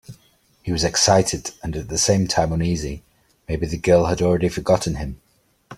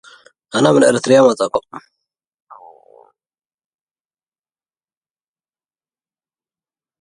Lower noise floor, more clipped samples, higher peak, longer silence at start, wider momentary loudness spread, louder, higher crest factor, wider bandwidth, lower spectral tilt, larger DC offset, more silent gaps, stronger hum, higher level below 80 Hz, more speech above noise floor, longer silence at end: second, -58 dBFS vs under -90 dBFS; neither; about the same, -2 dBFS vs 0 dBFS; second, 0.1 s vs 0.55 s; first, 14 LU vs 11 LU; second, -20 LUFS vs -14 LUFS; about the same, 18 dB vs 20 dB; first, 15.5 kHz vs 11.5 kHz; about the same, -4.5 dB/octave vs -5 dB/octave; neither; neither; neither; first, -38 dBFS vs -64 dBFS; second, 38 dB vs over 77 dB; second, 0 s vs 5.25 s